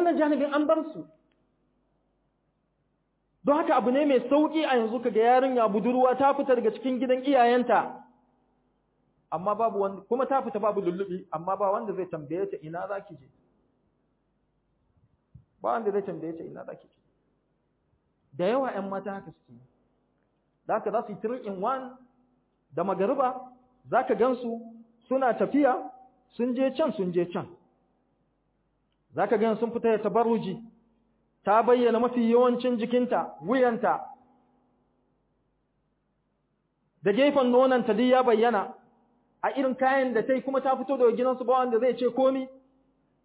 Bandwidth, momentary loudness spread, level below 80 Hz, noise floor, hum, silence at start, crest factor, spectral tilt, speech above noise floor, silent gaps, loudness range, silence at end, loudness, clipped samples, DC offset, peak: 4 kHz; 14 LU; -74 dBFS; -74 dBFS; none; 0 s; 18 dB; -9.5 dB/octave; 49 dB; none; 11 LU; 0.7 s; -26 LUFS; under 0.1%; under 0.1%; -10 dBFS